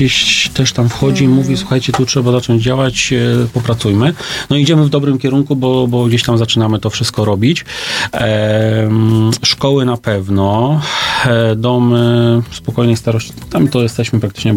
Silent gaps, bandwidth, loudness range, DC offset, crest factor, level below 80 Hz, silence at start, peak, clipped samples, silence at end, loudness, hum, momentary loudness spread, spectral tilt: none; 16 kHz; 1 LU; under 0.1%; 12 dB; -40 dBFS; 0 s; 0 dBFS; under 0.1%; 0 s; -13 LUFS; none; 5 LU; -5.5 dB/octave